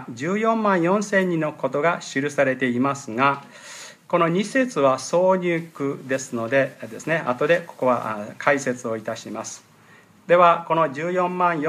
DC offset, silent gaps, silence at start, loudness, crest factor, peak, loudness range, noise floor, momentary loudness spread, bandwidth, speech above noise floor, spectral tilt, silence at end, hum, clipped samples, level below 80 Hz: under 0.1%; none; 0 s; -22 LUFS; 20 dB; -2 dBFS; 2 LU; -51 dBFS; 11 LU; 14 kHz; 30 dB; -5.5 dB/octave; 0 s; none; under 0.1%; -74 dBFS